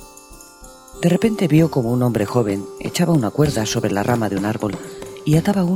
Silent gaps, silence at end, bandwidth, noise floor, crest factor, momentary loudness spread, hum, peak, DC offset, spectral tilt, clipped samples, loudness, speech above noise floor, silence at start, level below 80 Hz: none; 0 s; 16.5 kHz; -42 dBFS; 16 dB; 10 LU; none; -2 dBFS; under 0.1%; -6.5 dB/octave; under 0.1%; -19 LUFS; 24 dB; 0 s; -44 dBFS